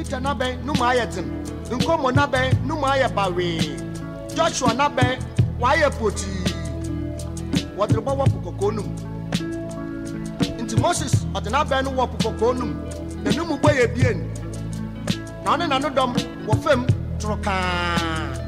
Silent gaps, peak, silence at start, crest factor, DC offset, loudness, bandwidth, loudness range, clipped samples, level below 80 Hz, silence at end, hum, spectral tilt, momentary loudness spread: none; -4 dBFS; 0 s; 18 dB; under 0.1%; -22 LUFS; 15 kHz; 3 LU; under 0.1%; -36 dBFS; 0 s; none; -5.5 dB/octave; 11 LU